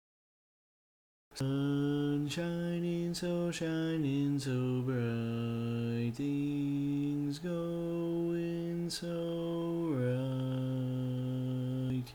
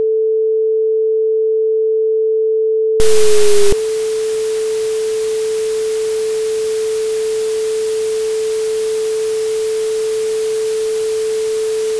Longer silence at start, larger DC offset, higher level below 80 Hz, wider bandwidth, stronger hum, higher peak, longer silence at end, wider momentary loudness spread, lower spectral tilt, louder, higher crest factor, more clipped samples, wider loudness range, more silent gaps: first, 1.3 s vs 0 s; neither; second, -64 dBFS vs -40 dBFS; first, 19 kHz vs 11 kHz; second, none vs 50 Hz at -60 dBFS; second, -22 dBFS vs 0 dBFS; about the same, 0 s vs 0 s; about the same, 4 LU vs 4 LU; first, -7 dB/octave vs -2.5 dB/octave; second, -35 LUFS vs -16 LUFS; about the same, 12 dB vs 14 dB; neither; about the same, 2 LU vs 3 LU; neither